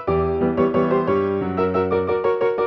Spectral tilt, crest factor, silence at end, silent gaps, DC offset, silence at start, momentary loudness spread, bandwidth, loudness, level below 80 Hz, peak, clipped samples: -9.5 dB/octave; 14 dB; 0 s; none; under 0.1%; 0 s; 2 LU; 5.8 kHz; -20 LUFS; -46 dBFS; -6 dBFS; under 0.1%